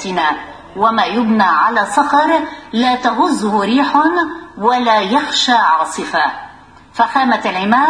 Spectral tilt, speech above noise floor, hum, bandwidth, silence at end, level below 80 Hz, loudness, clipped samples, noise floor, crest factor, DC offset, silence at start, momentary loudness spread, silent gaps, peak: -3.5 dB/octave; 26 dB; none; 10.5 kHz; 0 s; -52 dBFS; -14 LUFS; under 0.1%; -40 dBFS; 14 dB; under 0.1%; 0 s; 7 LU; none; 0 dBFS